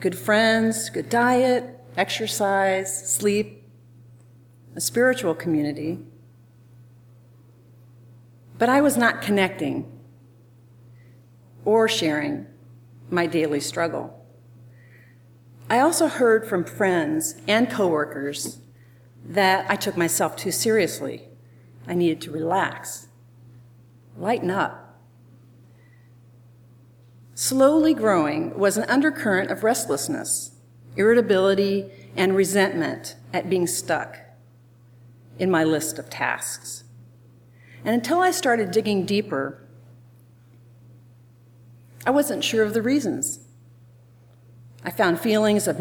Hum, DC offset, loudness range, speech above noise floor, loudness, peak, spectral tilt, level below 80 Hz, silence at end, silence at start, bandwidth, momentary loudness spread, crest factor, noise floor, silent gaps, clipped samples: none; under 0.1%; 7 LU; 30 dB; -22 LUFS; -4 dBFS; -4 dB/octave; -68 dBFS; 0 s; 0 s; over 20 kHz; 13 LU; 20 dB; -52 dBFS; none; under 0.1%